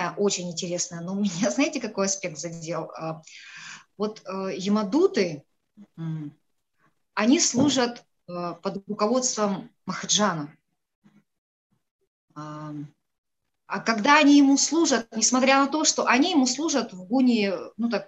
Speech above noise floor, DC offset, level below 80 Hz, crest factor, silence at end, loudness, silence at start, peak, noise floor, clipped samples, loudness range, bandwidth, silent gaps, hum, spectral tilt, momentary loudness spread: 46 dB; under 0.1%; -72 dBFS; 20 dB; 0.05 s; -23 LUFS; 0 s; -4 dBFS; -70 dBFS; under 0.1%; 10 LU; 8.8 kHz; 10.95-11.02 s, 11.38-11.70 s, 11.91-11.99 s, 12.07-12.28 s, 13.18-13.24 s; none; -3 dB/octave; 18 LU